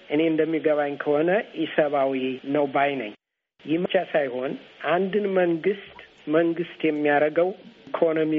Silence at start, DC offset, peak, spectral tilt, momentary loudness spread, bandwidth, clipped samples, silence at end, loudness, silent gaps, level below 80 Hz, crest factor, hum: 0.1 s; under 0.1%; -6 dBFS; -4.5 dB/octave; 11 LU; 5 kHz; under 0.1%; 0 s; -24 LUFS; none; -72 dBFS; 18 dB; none